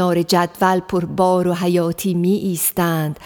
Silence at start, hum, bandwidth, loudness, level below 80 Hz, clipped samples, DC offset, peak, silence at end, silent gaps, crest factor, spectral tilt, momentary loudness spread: 0 s; none; over 20 kHz; -18 LUFS; -52 dBFS; under 0.1%; under 0.1%; -4 dBFS; 0 s; none; 14 dB; -5.5 dB/octave; 4 LU